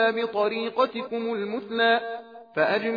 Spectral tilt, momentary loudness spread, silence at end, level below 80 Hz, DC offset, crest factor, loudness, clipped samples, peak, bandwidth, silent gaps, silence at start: -6.5 dB/octave; 10 LU; 0 s; -78 dBFS; under 0.1%; 16 dB; -25 LUFS; under 0.1%; -8 dBFS; 5 kHz; none; 0 s